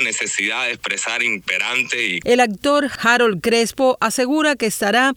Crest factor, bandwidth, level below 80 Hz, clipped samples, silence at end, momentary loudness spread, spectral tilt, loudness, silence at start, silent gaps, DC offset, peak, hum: 16 dB; 19.5 kHz; -56 dBFS; under 0.1%; 0 s; 4 LU; -2.5 dB/octave; -17 LUFS; 0 s; none; under 0.1%; -2 dBFS; none